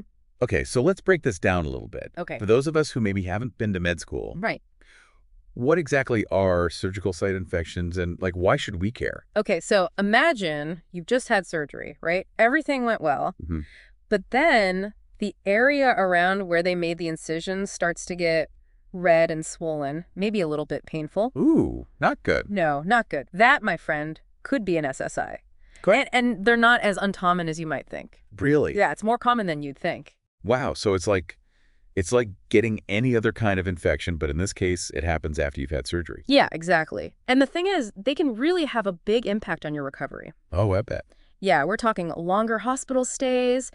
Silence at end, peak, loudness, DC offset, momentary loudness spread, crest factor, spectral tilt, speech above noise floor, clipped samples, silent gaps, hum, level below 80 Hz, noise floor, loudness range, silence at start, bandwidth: 0.05 s; -4 dBFS; -24 LUFS; under 0.1%; 11 LU; 20 dB; -5.5 dB/octave; 34 dB; under 0.1%; 30.28-30.38 s; none; -44 dBFS; -58 dBFS; 4 LU; 0.4 s; 11.5 kHz